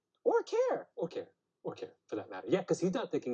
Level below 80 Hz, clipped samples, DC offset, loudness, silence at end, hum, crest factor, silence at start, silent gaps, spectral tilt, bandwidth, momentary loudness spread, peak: -82 dBFS; under 0.1%; under 0.1%; -35 LUFS; 0 s; none; 18 dB; 0.25 s; none; -6 dB/octave; 8.8 kHz; 14 LU; -16 dBFS